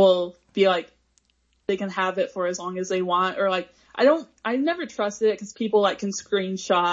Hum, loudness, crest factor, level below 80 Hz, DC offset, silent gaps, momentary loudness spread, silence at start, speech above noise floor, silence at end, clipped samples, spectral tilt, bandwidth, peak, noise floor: none; -24 LUFS; 18 dB; -68 dBFS; under 0.1%; none; 9 LU; 0 s; 44 dB; 0 s; under 0.1%; -4.5 dB/octave; 7.8 kHz; -6 dBFS; -67 dBFS